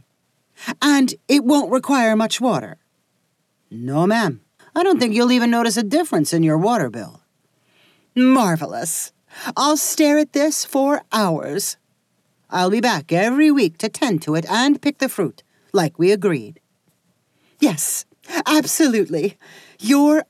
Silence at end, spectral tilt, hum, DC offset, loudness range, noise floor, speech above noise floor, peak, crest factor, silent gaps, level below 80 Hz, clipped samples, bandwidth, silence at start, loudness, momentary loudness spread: 0.05 s; -4.5 dB/octave; none; under 0.1%; 3 LU; -68 dBFS; 50 dB; -4 dBFS; 16 dB; none; -82 dBFS; under 0.1%; 15.5 kHz; 0.6 s; -18 LUFS; 11 LU